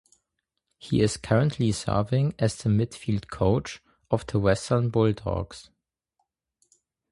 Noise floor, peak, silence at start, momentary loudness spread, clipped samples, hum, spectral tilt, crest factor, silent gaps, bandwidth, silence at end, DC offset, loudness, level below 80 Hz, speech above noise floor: -81 dBFS; -6 dBFS; 0.85 s; 8 LU; under 0.1%; none; -6.5 dB/octave; 20 dB; none; 11.5 kHz; 1.5 s; under 0.1%; -26 LUFS; -46 dBFS; 57 dB